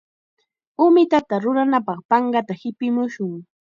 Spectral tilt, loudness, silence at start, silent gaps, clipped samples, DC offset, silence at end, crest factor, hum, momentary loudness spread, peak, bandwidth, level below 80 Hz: -7.5 dB/octave; -19 LUFS; 0.8 s; 2.05-2.09 s; under 0.1%; under 0.1%; 0.2 s; 16 dB; none; 14 LU; -4 dBFS; 7.2 kHz; -68 dBFS